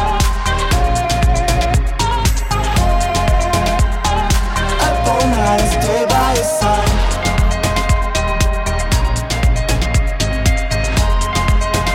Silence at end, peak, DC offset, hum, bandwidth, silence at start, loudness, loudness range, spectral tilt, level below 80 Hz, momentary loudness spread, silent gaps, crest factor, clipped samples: 0 s; -2 dBFS; under 0.1%; none; 16.5 kHz; 0 s; -16 LUFS; 2 LU; -4.5 dB/octave; -18 dBFS; 3 LU; none; 12 dB; under 0.1%